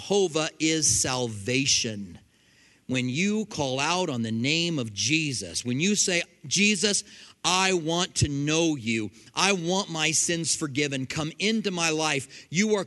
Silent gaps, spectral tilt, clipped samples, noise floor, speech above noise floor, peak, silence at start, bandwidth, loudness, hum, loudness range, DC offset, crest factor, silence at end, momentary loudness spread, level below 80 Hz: none; -3 dB/octave; under 0.1%; -60 dBFS; 34 dB; -4 dBFS; 0 s; 12 kHz; -25 LUFS; none; 3 LU; under 0.1%; 22 dB; 0 s; 7 LU; -56 dBFS